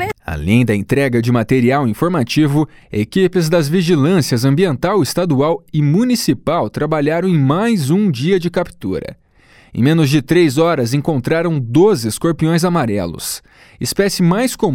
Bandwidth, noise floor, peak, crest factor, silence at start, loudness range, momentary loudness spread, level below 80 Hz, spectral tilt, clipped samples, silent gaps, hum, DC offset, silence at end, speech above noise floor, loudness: 17.5 kHz; -48 dBFS; 0 dBFS; 14 dB; 0 s; 2 LU; 8 LU; -42 dBFS; -6 dB/octave; under 0.1%; none; none; under 0.1%; 0 s; 33 dB; -15 LUFS